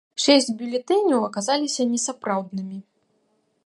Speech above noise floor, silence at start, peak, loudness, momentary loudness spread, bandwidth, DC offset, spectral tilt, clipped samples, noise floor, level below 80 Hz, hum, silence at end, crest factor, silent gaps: 46 dB; 0.15 s; -4 dBFS; -22 LUFS; 15 LU; 11.5 kHz; under 0.1%; -3 dB/octave; under 0.1%; -68 dBFS; -78 dBFS; none; 0.85 s; 20 dB; none